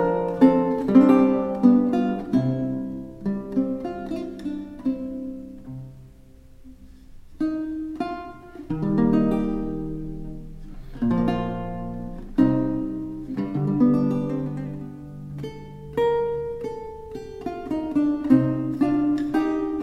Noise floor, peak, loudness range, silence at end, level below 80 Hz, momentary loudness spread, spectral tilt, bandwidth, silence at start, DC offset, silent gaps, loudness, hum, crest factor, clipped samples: -47 dBFS; -4 dBFS; 12 LU; 0 s; -42 dBFS; 19 LU; -9.5 dB/octave; 6.4 kHz; 0 s; under 0.1%; none; -23 LUFS; none; 20 dB; under 0.1%